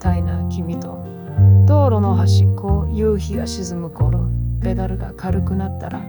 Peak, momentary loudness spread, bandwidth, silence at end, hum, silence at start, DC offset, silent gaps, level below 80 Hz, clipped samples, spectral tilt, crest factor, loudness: -4 dBFS; 13 LU; over 20 kHz; 0 s; none; 0 s; under 0.1%; none; -28 dBFS; under 0.1%; -8 dB/octave; 12 dB; -18 LUFS